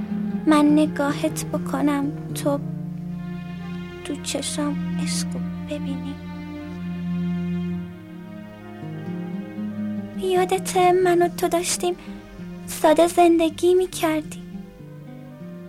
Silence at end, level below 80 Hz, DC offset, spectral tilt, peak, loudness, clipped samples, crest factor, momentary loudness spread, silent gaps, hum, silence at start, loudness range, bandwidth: 0 s; -52 dBFS; under 0.1%; -5.5 dB/octave; -6 dBFS; -23 LUFS; under 0.1%; 18 dB; 20 LU; none; none; 0 s; 10 LU; 16 kHz